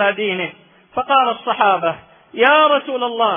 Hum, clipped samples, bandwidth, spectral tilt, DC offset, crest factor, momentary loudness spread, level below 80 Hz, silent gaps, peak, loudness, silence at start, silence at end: none; under 0.1%; 3.7 kHz; -9 dB/octave; under 0.1%; 16 dB; 15 LU; -62 dBFS; none; 0 dBFS; -16 LUFS; 0 s; 0 s